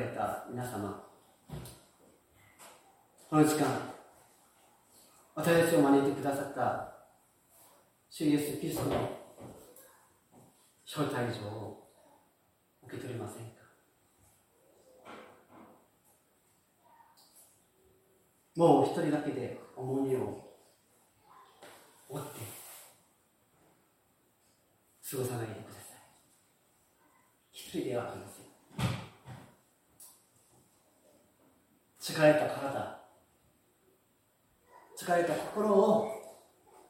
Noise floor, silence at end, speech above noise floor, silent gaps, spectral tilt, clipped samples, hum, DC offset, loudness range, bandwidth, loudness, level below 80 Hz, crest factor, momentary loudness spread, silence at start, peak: -71 dBFS; 0.55 s; 41 dB; none; -5.5 dB/octave; under 0.1%; none; under 0.1%; 17 LU; 16.5 kHz; -32 LUFS; -70 dBFS; 24 dB; 27 LU; 0 s; -12 dBFS